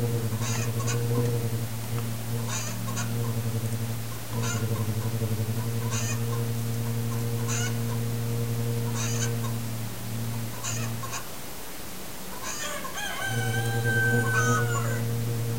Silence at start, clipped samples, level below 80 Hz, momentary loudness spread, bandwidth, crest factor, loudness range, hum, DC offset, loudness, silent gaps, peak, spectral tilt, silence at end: 0 s; under 0.1%; -52 dBFS; 9 LU; 16 kHz; 16 dB; 5 LU; none; 1%; -29 LUFS; none; -12 dBFS; -4.5 dB/octave; 0 s